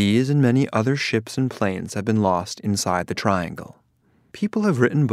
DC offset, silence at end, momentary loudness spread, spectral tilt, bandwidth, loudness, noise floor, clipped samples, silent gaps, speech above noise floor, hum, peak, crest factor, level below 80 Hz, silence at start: under 0.1%; 0 s; 8 LU; -6 dB/octave; 14.5 kHz; -22 LUFS; -62 dBFS; under 0.1%; none; 41 dB; none; -2 dBFS; 18 dB; -58 dBFS; 0 s